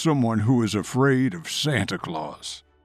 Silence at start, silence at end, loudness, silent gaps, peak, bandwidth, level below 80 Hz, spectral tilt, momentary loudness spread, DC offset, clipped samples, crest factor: 0 s; 0.25 s; -23 LUFS; none; -8 dBFS; 14 kHz; -60 dBFS; -5.5 dB/octave; 12 LU; under 0.1%; under 0.1%; 14 dB